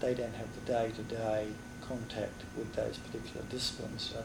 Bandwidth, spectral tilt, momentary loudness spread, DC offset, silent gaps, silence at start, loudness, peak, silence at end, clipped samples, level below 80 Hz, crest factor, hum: 19.5 kHz; -5 dB/octave; 8 LU; under 0.1%; none; 0 s; -38 LUFS; -22 dBFS; 0 s; under 0.1%; -56 dBFS; 16 dB; none